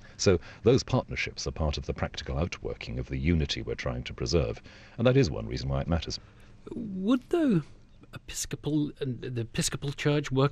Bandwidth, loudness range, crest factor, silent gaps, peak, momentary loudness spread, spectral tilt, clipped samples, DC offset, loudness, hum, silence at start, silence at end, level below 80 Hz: 14 kHz; 2 LU; 20 dB; none; -10 dBFS; 12 LU; -5.5 dB/octave; under 0.1%; under 0.1%; -30 LUFS; none; 0.05 s; 0 s; -42 dBFS